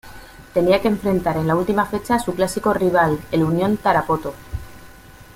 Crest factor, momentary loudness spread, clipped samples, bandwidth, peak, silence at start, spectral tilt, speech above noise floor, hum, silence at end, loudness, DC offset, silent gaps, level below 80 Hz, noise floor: 18 dB; 7 LU; under 0.1%; 16.5 kHz; -2 dBFS; 0.05 s; -6.5 dB/octave; 24 dB; none; 0.15 s; -19 LUFS; under 0.1%; none; -42 dBFS; -42 dBFS